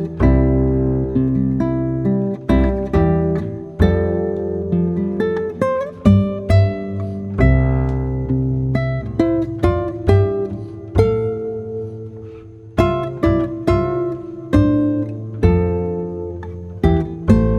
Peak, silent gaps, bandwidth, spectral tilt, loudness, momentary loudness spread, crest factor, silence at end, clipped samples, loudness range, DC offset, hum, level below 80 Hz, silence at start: 0 dBFS; none; 8.6 kHz; -9.5 dB/octave; -18 LUFS; 11 LU; 16 dB; 0 s; under 0.1%; 3 LU; under 0.1%; none; -26 dBFS; 0 s